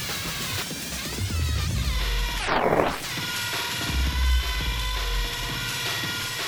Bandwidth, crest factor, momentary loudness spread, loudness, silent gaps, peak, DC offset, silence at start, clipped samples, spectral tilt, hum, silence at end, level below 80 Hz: over 20 kHz; 20 dB; 5 LU; -26 LUFS; none; -6 dBFS; under 0.1%; 0 s; under 0.1%; -3.5 dB/octave; none; 0 s; -30 dBFS